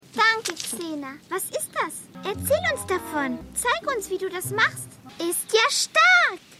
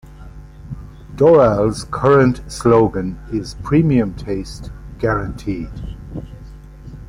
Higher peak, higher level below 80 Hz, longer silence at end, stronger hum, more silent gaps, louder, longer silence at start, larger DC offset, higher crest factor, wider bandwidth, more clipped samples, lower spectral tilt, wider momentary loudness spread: second, -6 dBFS vs -2 dBFS; second, -58 dBFS vs -34 dBFS; about the same, 0.05 s vs 0.05 s; neither; neither; second, -23 LUFS vs -16 LUFS; about the same, 0.15 s vs 0.05 s; neither; about the same, 18 dB vs 16 dB; first, 16 kHz vs 14.5 kHz; neither; second, -2 dB/octave vs -7.5 dB/octave; second, 14 LU vs 22 LU